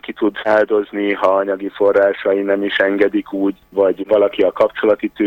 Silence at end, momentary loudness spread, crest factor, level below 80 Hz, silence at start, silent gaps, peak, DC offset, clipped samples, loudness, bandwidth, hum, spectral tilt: 0 s; 6 LU; 14 dB; -56 dBFS; 0.05 s; none; -2 dBFS; under 0.1%; under 0.1%; -16 LUFS; 16.5 kHz; none; -6.5 dB/octave